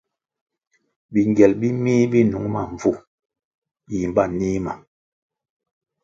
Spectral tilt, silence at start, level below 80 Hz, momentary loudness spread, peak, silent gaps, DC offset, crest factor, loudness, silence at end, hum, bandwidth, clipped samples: -8 dB/octave; 1.1 s; -50 dBFS; 13 LU; 0 dBFS; 3.07-3.18 s, 3.25-3.29 s, 3.45-3.62 s; under 0.1%; 22 dB; -20 LUFS; 1.25 s; none; 7.6 kHz; under 0.1%